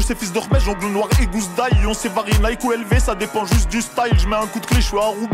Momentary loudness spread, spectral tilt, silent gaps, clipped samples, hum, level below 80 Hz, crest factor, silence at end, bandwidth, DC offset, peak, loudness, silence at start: 3 LU; -5 dB/octave; none; under 0.1%; none; -22 dBFS; 14 dB; 0 s; 16.5 kHz; under 0.1%; -4 dBFS; -19 LUFS; 0 s